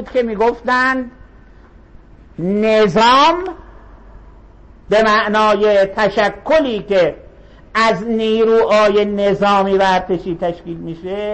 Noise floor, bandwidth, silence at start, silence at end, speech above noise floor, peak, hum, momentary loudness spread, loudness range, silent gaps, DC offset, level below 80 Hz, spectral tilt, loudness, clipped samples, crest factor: -42 dBFS; 8.6 kHz; 0 s; 0 s; 28 dB; -4 dBFS; none; 11 LU; 2 LU; none; under 0.1%; -42 dBFS; -5 dB/octave; -14 LUFS; under 0.1%; 12 dB